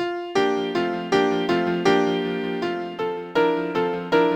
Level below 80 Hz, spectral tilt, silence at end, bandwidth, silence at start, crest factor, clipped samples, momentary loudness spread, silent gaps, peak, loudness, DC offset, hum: -60 dBFS; -5.5 dB/octave; 0 s; 15.5 kHz; 0 s; 16 dB; under 0.1%; 7 LU; none; -6 dBFS; -23 LUFS; under 0.1%; none